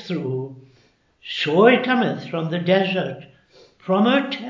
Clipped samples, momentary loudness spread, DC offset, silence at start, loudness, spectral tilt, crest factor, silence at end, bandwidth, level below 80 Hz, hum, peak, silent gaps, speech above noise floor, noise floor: under 0.1%; 19 LU; under 0.1%; 0 s; -20 LUFS; -7 dB/octave; 22 dB; 0 s; 7.6 kHz; -70 dBFS; none; 0 dBFS; none; 39 dB; -59 dBFS